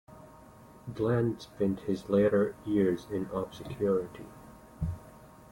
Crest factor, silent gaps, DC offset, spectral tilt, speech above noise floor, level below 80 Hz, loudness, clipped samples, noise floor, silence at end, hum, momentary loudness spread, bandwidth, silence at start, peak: 16 dB; none; under 0.1%; -8 dB/octave; 24 dB; -54 dBFS; -31 LUFS; under 0.1%; -53 dBFS; 0.25 s; none; 18 LU; 16.5 kHz; 0.1 s; -14 dBFS